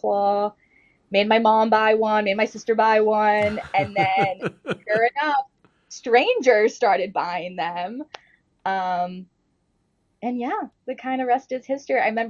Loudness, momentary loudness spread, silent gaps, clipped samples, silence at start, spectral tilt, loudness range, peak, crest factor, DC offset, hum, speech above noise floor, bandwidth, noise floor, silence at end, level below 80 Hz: -21 LUFS; 14 LU; none; under 0.1%; 0.05 s; -5 dB/octave; 10 LU; -2 dBFS; 20 dB; under 0.1%; none; 48 dB; 9 kHz; -69 dBFS; 0 s; -66 dBFS